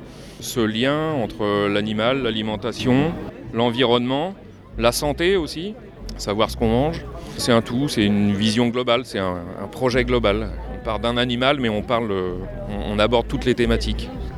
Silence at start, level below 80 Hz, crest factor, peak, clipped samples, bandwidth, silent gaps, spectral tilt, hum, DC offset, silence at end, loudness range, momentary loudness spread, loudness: 0 s; -36 dBFS; 20 dB; -2 dBFS; under 0.1%; 14.5 kHz; none; -5.5 dB/octave; none; under 0.1%; 0 s; 2 LU; 11 LU; -21 LUFS